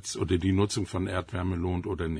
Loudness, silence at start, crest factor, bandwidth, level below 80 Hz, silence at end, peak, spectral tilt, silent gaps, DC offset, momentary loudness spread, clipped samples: -29 LUFS; 0 s; 16 dB; 10.5 kHz; -46 dBFS; 0 s; -12 dBFS; -6 dB/octave; none; under 0.1%; 5 LU; under 0.1%